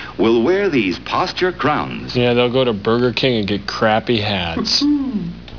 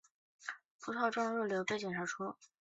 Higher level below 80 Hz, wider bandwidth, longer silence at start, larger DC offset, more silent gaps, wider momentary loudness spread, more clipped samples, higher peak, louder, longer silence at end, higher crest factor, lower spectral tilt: first, -42 dBFS vs -82 dBFS; second, 5.4 kHz vs 8 kHz; second, 0 s vs 0.4 s; first, 0.5% vs under 0.1%; second, none vs 0.66-0.79 s; second, 5 LU vs 13 LU; neither; first, -2 dBFS vs -20 dBFS; first, -17 LUFS vs -38 LUFS; second, 0 s vs 0.15 s; about the same, 14 dB vs 18 dB; first, -5.5 dB/octave vs -3.5 dB/octave